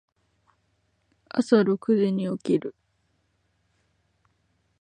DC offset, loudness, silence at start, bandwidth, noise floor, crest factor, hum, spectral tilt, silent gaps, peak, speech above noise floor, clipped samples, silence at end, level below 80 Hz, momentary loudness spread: under 0.1%; -24 LUFS; 1.35 s; 9.6 kHz; -71 dBFS; 22 dB; none; -7.5 dB/octave; none; -6 dBFS; 48 dB; under 0.1%; 2.1 s; -72 dBFS; 9 LU